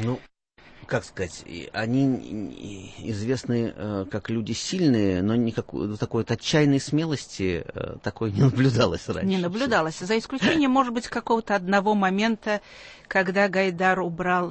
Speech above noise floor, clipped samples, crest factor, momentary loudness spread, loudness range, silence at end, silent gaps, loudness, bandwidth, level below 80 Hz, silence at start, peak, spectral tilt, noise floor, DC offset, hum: 27 dB; under 0.1%; 18 dB; 12 LU; 5 LU; 0 s; none; -25 LUFS; 8.8 kHz; -52 dBFS; 0 s; -6 dBFS; -6 dB/octave; -51 dBFS; under 0.1%; none